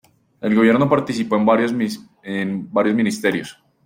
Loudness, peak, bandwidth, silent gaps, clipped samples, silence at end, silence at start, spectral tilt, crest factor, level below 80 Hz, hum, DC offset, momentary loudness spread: -19 LUFS; -4 dBFS; 16 kHz; none; under 0.1%; 0.35 s; 0.4 s; -6 dB/octave; 16 dB; -60 dBFS; none; under 0.1%; 12 LU